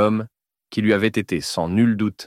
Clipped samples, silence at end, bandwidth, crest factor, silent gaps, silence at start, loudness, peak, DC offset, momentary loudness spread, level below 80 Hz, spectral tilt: under 0.1%; 0 s; 15 kHz; 16 dB; none; 0 s; -21 LUFS; -4 dBFS; under 0.1%; 9 LU; -52 dBFS; -6 dB/octave